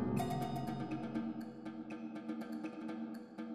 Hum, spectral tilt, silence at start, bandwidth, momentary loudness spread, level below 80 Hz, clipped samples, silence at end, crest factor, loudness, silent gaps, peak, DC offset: none; -7 dB/octave; 0 s; 15.5 kHz; 9 LU; -68 dBFS; under 0.1%; 0 s; 16 dB; -43 LUFS; none; -24 dBFS; under 0.1%